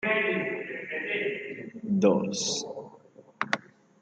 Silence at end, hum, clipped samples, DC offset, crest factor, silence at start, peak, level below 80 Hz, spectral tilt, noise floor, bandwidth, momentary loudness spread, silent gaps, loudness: 0.4 s; none; under 0.1%; under 0.1%; 22 dB; 0 s; -8 dBFS; -72 dBFS; -4 dB/octave; -54 dBFS; 9.4 kHz; 15 LU; none; -29 LUFS